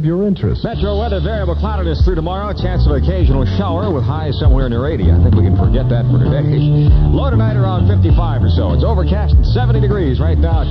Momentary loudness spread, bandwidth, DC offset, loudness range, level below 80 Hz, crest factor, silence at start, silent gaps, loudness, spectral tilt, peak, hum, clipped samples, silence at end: 6 LU; 5.8 kHz; 0.2%; 3 LU; -16 dBFS; 12 dB; 0 s; none; -14 LUFS; -10 dB/octave; 0 dBFS; none; under 0.1%; 0 s